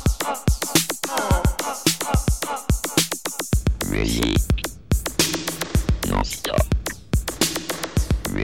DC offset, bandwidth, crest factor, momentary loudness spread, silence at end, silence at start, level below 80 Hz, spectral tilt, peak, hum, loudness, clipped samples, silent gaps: 0.4%; 17 kHz; 20 dB; 5 LU; 0 s; 0 s; -26 dBFS; -4 dB/octave; -2 dBFS; none; -22 LUFS; under 0.1%; none